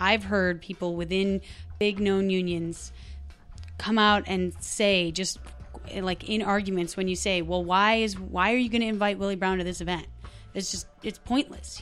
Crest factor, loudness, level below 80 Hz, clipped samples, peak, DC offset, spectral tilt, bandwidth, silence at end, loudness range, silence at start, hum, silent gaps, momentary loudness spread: 20 dB; -26 LUFS; -46 dBFS; under 0.1%; -8 dBFS; under 0.1%; -4 dB/octave; 13 kHz; 0 s; 3 LU; 0 s; none; none; 19 LU